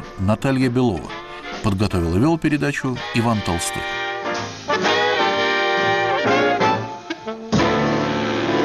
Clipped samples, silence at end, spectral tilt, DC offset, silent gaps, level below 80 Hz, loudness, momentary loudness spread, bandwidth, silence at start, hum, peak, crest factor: under 0.1%; 0 s; -5 dB/octave; under 0.1%; none; -42 dBFS; -20 LUFS; 9 LU; 15 kHz; 0 s; none; -8 dBFS; 12 dB